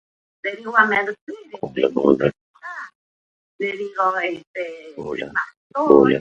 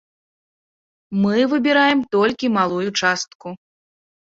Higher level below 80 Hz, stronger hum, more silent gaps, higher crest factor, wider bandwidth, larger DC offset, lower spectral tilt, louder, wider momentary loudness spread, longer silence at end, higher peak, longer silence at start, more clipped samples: first, -56 dBFS vs -62 dBFS; neither; first, 1.21-1.27 s, 2.41-2.54 s, 2.95-3.59 s, 4.47-4.54 s, 5.57-5.70 s vs 3.35-3.40 s; about the same, 20 dB vs 18 dB; about the same, 7.6 kHz vs 7.8 kHz; neither; first, -7 dB/octave vs -4.5 dB/octave; about the same, -20 LUFS vs -18 LUFS; first, 19 LU vs 13 LU; second, 0 s vs 0.8 s; about the same, 0 dBFS vs -2 dBFS; second, 0.45 s vs 1.1 s; neither